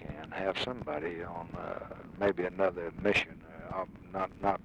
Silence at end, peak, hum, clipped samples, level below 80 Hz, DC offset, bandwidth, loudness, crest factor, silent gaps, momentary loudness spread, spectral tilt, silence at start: 0 s; -16 dBFS; none; under 0.1%; -56 dBFS; under 0.1%; 11.5 kHz; -34 LUFS; 20 dB; none; 12 LU; -5.5 dB/octave; 0 s